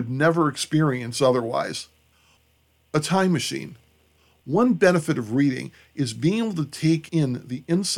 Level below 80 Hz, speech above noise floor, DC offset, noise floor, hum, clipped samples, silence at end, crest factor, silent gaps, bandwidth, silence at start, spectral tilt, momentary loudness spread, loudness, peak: -62 dBFS; 41 dB; under 0.1%; -63 dBFS; none; under 0.1%; 0 s; 18 dB; none; 15.5 kHz; 0 s; -5.5 dB/octave; 12 LU; -23 LUFS; -6 dBFS